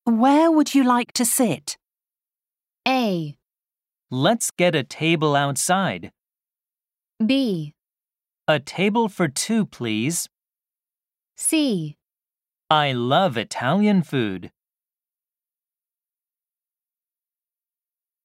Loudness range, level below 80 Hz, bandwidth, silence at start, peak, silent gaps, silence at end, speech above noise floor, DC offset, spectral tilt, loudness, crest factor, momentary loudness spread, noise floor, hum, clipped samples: 4 LU; -72 dBFS; 16 kHz; 0.05 s; -2 dBFS; none; 3.75 s; over 70 dB; under 0.1%; -4.5 dB/octave; -21 LUFS; 20 dB; 11 LU; under -90 dBFS; none; under 0.1%